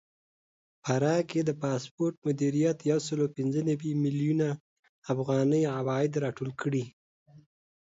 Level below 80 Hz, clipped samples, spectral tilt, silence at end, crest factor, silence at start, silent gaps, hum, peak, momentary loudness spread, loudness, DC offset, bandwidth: -72 dBFS; under 0.1%; -7 dB/octave; 0.45 s; 16 dB; 0.85 s; 1.91-1.98 s, 2.18-2.22 s, 4.60-4.83 s, 4.89-5.02 s, 6.93-7.26 s; none; -14 dBFS; 7 LU; -29 LUFS; under 0.1%; 8 kHz